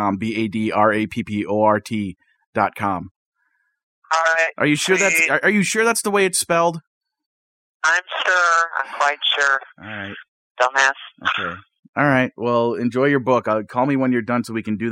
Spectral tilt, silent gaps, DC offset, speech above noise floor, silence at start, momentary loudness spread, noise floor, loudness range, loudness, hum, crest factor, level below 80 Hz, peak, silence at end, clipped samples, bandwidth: -3.5 dB/octave; 2.47-2.53 s, 3.11-3.32 s, 3.83-4.02 s, 6.87-7.01 s, 7.26-7.80 s, 10.28-10.55 s, 11.79-11.83 s, 11.89-11.93 s; under 0.1%; 49 dB; 0 s; 11 LU; -68 dBFS; 4 LU; -19 LUFS; none; 18 dB; -62 dBFS; -2 dBFS; 0 s; under 0.1%; 16 kHz